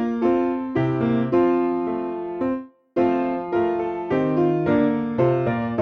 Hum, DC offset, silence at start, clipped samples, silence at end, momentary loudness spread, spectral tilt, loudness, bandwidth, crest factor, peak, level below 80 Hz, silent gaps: none; under 0.1%; 0 s; under 0.1%; 0 s; 7 LU; -10 dB/octave; -22 LUFS; 5.2 kHz; 14 dB; -8 dBFS; -54 dBFS; none